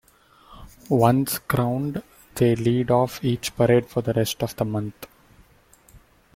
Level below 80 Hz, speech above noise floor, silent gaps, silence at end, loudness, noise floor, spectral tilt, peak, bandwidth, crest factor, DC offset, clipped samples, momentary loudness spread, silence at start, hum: -52 dBFS; 34 dB; none; 0.4 s; -22 LUFS; -55 dBFS; -6 dB/octave; -4 dBFS; 16.5 kHz; 20 dB; under 0.1%; under 0.1%; 14 LU; 0.5 s; none